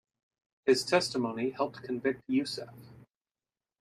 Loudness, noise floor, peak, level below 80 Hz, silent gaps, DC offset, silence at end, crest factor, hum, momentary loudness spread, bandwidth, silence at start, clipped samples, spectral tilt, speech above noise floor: -31 LUFS; under -90 dBFS; -12 dBFS; -74 dBFS; none; under 0.1%; 0.8 s; 22 dB; none; 11 LU; 14.5 kHz; 0.65 s; under 0.1%; -4 dB/octave; over 59 dB